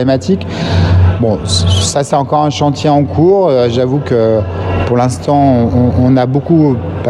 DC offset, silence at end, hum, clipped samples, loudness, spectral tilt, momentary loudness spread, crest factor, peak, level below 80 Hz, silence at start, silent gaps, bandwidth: under 0.1%; 0 s; none; under 0.1%; -11 LUFS; -6.5 dB/octave; 4 LU; 10 dB; 0 dBFS; -36 dBFS; 0 s; none; 11.5 kHz